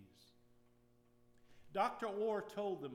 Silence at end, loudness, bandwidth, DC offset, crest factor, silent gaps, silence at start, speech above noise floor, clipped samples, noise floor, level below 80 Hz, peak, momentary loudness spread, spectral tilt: 0 s; -41 LUFS; 16 kHz; under 0.1%; 20 dB; none; 0 s; 31 dB; under 0.1%; -71 dBFS; -80 dBFS; -24 dBFS; 4 LU; -5.5 dB/octave